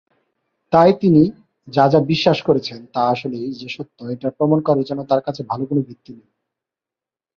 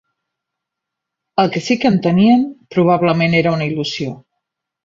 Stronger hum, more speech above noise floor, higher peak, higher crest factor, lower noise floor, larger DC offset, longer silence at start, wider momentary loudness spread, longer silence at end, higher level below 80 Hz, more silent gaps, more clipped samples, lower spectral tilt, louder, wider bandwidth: neither; first, 71 dB vs 66 dB; about the same, 0 dBFS vs -2 dBFS; about the same, 18 dB vs 16 dB; first, -89 dBFS vs -81 dBFS; neither; second, 0.7 s vs 1.35 s; first, 14 LU vs 9 LU; first, 1.25 s vs 0.65 s; about the same, -56 dBFS vs -54 dBFS; neither; neither; first, -8 dB/octave vs -6.5 dB/octave; second, -18 LUFS vs -15 LUFS; about the same, 7 kHz vs 7.6 kHz